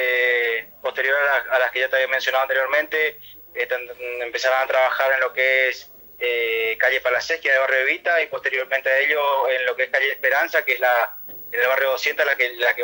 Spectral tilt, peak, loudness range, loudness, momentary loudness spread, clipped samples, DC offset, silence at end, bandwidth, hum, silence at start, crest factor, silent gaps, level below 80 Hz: -0.5 dB/octave; -6 dBFS; 2 LU; -20 LUFS; 8 LU; under 0.1%; under 0.1%; 0 s; 16.5 kHz; none; 0 s; 14 dB; none; -66 dBFS